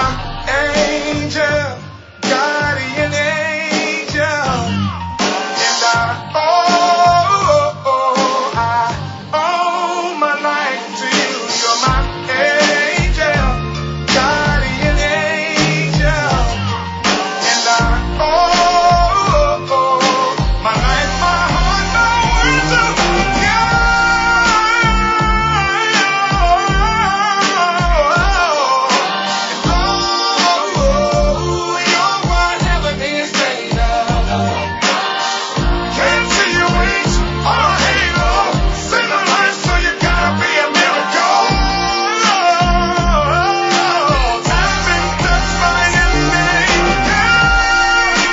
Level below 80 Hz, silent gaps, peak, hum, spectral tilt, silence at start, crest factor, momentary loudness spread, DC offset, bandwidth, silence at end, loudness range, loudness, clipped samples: -22 dBFS; none; 0 dBFS; none; -3.5 dB/octave; 0 s; 14 dB; 6 LU; under 0.1%; 7.8 kHz; 0 s; 4 LU; -14 LUFS; under 0.1%